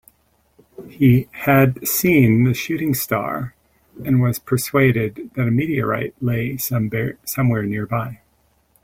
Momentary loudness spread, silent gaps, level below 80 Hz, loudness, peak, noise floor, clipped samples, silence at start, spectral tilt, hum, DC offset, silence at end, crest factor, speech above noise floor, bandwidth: 9 LU; none; -48 dBFS; -19 LUFS; -2 dBFS; -61 dBFS; under 0.1%; 0.8 s; -6.5 dB/octave; none; under 0.1%; 0.7 s; 18 dB; 43 dB; 16.5 kHz